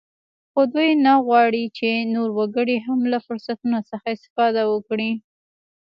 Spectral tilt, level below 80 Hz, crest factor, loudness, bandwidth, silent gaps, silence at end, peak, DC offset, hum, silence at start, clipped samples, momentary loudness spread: -7.5 dB/octave; -72 dBFS; 16 dB; -20 LUFS; 5.8 kHz; 4.30-4.36 s; 0.65 s; -4 dBFS; under 0.1%; none; 0.55 s; under 0.1%; 11 LU